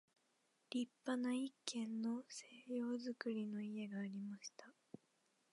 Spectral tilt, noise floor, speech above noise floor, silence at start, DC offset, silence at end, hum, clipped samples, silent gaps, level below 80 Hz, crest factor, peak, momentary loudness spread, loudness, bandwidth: -4.5 dB/octave; -81 dBFS; 36 dB; 0.7 s; under 0.1%; 0.8 s; none; under 0.1%; none; under -90 dBFS; 22 dB; -24 dBFS; 16 LU; -46 LUFS; 11 kHz